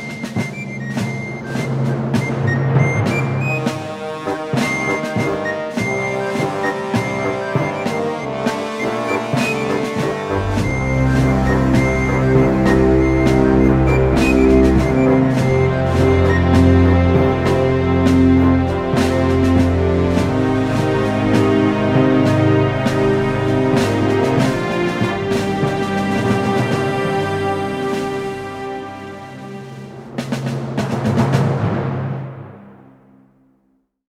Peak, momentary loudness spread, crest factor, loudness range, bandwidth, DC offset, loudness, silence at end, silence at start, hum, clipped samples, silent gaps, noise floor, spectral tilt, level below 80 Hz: 0 dBFS; 11 LU; 16 dB; 7 LU; 13.5 kHz; under 0.1%; -17 LUFS; 1.35 s; 0 s; none; under 0.1%; none; -62 dBFS; -7 dB/octave; -30 dBFS